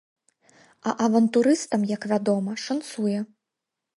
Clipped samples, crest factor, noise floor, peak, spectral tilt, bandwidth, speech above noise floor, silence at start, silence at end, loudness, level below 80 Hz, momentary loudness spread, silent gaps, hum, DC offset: under 0.1%; 18 dB; -85 dBFS; -8 dBFS; -5.5 dB/octave; 11.5 kHz; 62 dB; 0.85 s; 0.75 s; -24 LUFS; -74 dBFS; 11 LU; none; none; under 0.1%